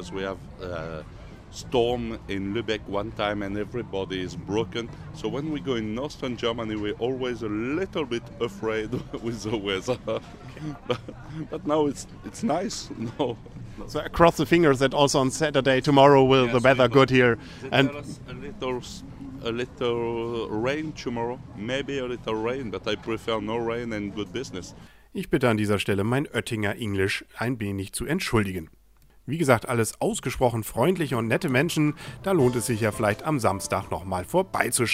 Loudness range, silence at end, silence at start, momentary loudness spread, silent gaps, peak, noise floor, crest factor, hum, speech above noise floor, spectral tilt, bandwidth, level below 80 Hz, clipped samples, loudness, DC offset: 10 LU; 0 s; 0 s; 15 LU; none; -2 dBFS; -56 dBFS; 22 dB; none; 31 dB; -5 dB/octave; 16 kHz; -48 dBFS; under 0.1%; -25 LUFS; under 0.1%